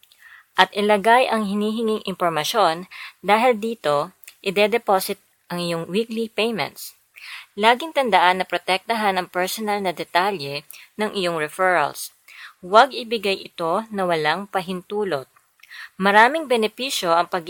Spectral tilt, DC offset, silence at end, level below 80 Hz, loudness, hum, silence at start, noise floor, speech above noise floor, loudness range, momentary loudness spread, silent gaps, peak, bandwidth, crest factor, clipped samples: -4 dB/octave; under 0.1%; 0 s; -70 dBFS; -21 LUFS; none; 0.55 s; -49 dBFS; 29 dB; 3 LU; 16 LU; none; 0 dBFS; 19 kHz; 22 dB; under 0.1%